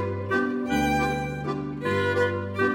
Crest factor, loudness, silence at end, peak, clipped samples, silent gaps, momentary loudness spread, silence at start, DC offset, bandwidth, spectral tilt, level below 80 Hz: 14 dB; -26 LUFS; 0 s; -12 dBFS; under 0.1%; none; 6 LU; 0 s; under 0.1%; 17 kHz; -6 dB/octave; -46 dBFS